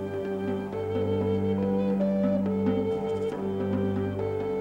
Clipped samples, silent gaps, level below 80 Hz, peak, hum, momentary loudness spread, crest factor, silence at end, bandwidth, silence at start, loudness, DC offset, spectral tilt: under 0.1%; none; -56 dBFS; -14 dBFS; 50 Hz at -60 dBFS; 5 LU; 12 dB; 0 s; 7.6 kHz; 0 s; -28 LUFS; under 0.1%; -9 dB/octave